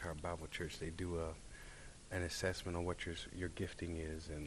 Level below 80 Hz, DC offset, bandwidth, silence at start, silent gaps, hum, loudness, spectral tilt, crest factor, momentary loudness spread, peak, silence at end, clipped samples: -54 dBFS; under 0.1%; 13 kHz; 0 s; none; none; -44 LUFS; -5 dB/octave; 20 dB; 13 LU; -26 dBFS; 0 s; under 0.1%